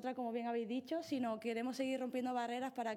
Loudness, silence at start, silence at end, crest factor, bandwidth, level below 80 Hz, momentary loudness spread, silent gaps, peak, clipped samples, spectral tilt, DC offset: -40 LUFS; 0 s; 0 s; 14 dB; 16.5 kHz; under -90 dBFS; 2 LU; none; -26 dBFS; under 0.1%; -4.5 dB/octave; under 0.1%